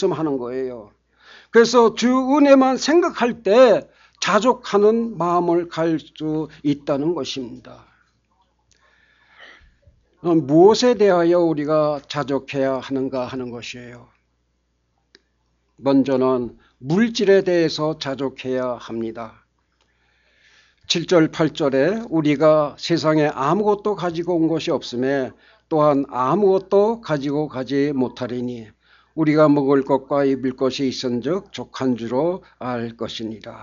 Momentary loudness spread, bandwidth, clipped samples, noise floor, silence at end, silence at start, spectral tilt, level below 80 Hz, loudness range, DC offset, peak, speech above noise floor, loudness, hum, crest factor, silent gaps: 13 LU; 7.6 kHz; under 0.1%; -68 dBFS; 0 s; 0 s; -5.5 dB/octave; -58 dBFS; 10 LU; under 0.1%; -2 dBFS; 49 dB; -19 LUFS; none; 18 dB; none